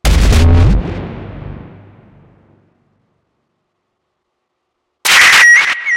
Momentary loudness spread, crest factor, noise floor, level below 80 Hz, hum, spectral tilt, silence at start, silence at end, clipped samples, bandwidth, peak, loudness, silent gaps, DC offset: 25 LU; 12 dB; -70 dBFS; -20 dBFS; none; -3 dB/octave; 0.05 s; 0 s; under 0.1%; 17 kHz; 0 dBFS; -7 LUFS; none; under 0.1%